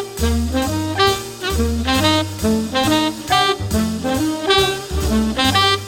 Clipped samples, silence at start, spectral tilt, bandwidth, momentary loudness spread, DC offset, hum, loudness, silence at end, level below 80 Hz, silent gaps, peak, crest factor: under 0.1%; 0 s; -4 dB/octave; 17 kHz; 5 LU; under 0.1%; none; -17 LUFS; 0 s; -28 dBFS; none; 0 dBFS; 18 dB